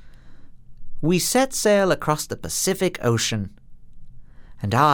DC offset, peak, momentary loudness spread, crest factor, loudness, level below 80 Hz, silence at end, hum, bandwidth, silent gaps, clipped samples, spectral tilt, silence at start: under 0.1%; -4 dBFS; 9 LU; 20 dB; -21 LUFS; -44 dBFS; 0 s; none; over 20 kHz; none; under 0.1%; -4 dB/octave; 0 s